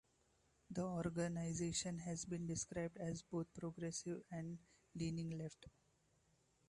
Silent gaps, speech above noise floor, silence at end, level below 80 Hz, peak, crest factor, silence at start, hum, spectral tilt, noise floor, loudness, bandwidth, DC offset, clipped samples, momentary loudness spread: none; 33 dB; 1 s; -70 dBFS; -30 dBFS; 18 dB; 0.7 s; none; -5 dB/octave; -78 dBFS; -46 LUFS; 11.5 kHz; under 0.1%; under 0.1%; 10 LU